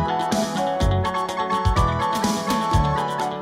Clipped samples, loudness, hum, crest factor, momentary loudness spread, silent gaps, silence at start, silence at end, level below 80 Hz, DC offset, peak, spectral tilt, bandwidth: under 0.1%; -22 LUFS; none; 14 dB; 3 LU; none; 0 s; 0 s; -30 dBFS; under 0.1%; -6 dBFS; -5.5 dB/octave; 16 kHz